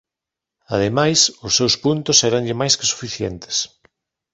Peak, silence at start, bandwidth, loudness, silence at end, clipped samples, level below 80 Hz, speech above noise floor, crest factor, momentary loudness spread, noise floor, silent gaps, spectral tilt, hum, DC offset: -2 dBFS; 0.7 s; 8.4 kHz; -17 LUFS; 0.65 s; under 0.1%; -50 dBFS; 67 dB; 20 dB; 11 LU; -86 dBFS; none; -3 dB/octave; none; under 0.1%